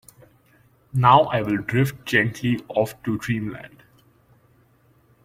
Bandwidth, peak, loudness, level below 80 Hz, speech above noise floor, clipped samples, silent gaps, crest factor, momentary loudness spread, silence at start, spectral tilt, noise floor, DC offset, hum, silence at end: 16 kHz; -2 dBFS; -21 LUFS; -56 dBFS; 38 dB; under 0.1%; none; 22 dB; 13 LU; 0.95 s; -6.5 dB/octave; -59 dBFS; under 0.1%; none; 1.55 s